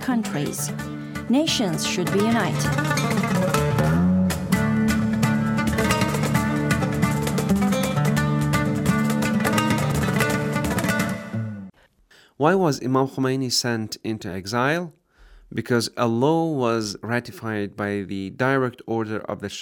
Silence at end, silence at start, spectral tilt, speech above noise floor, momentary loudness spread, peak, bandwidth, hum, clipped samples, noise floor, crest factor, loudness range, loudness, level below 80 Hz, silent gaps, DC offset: 0 s; 0 s; -5.5 dB/octave; 33 dB; 9 LU; -4 dBFS; 18.5 kHz; none; under 0.1%; -56 dBFS; 18 dB; 3 LU; -22 LUFS; -46 dBFS; none; under 0.1%